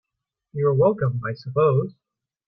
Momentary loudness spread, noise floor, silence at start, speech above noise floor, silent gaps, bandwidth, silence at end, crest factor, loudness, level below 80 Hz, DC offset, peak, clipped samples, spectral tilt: 12 LU; -84 dBFS; 0.55 s; 63 dB; none; 5.6 kHz; 0.55 s; 16 dB; -22 LUFS; -60 dBFS; under 0.1%; -6 dBFS; under 0.1%; -11 dB/octave